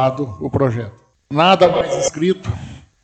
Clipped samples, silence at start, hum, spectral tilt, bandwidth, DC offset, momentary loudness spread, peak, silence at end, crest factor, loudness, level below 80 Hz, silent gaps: under 0.1%; 0 s; none; -5 dB/octave; 9 kHz; under 0.1%; 16 LU; 0 dBFS; 0.25 s; 16 dB; -17 LUFS; -44 dBFS; none